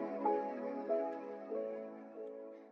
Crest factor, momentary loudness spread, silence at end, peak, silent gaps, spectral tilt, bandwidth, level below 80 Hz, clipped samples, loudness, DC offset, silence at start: 18 dB; 13 LU; 0 s; -24 dBFS; none; -8 dB/octave; 6.2 kHz; under -90 dBFS; under 0.1%; -41 LUFS; under 0.1%; 0 s